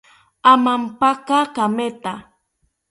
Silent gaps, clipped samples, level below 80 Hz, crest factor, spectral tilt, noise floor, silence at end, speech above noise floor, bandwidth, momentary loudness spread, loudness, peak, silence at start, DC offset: none; under 0.1%; -62 dBFS; 18 dB; -4.5 dB/octave; -68 dBFS; 0.7 s; 51 dB; 11.5 kHz; 16 LU; -17 LUFS; 0 dBFS; 0.45 s; under 0.1%